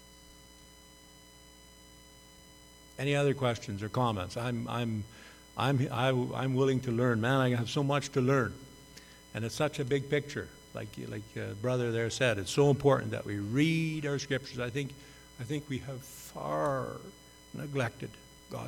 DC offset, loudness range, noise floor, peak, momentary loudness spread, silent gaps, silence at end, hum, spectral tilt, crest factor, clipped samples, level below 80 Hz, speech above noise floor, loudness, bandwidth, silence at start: under 0.1%; 7 LU; -56 dBFS; -12 dBFS; 18 LU; none; 0 s; none; -6 dB/octave; 20 dB; under 0.1%; -60 dBFS; 24 dB; -32 LUFS; 18 kHz; 0 s